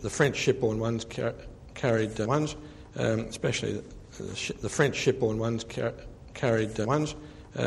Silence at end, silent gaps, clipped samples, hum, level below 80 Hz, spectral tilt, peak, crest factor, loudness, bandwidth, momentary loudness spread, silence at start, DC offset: 0 s; none; under 0.1%; none; -50 dBFS; -5 dB/octave; -10 dBFS; 20 dB; -29 LUFS; 12.5 kHz; 16 LU; 0 s; under 0.1%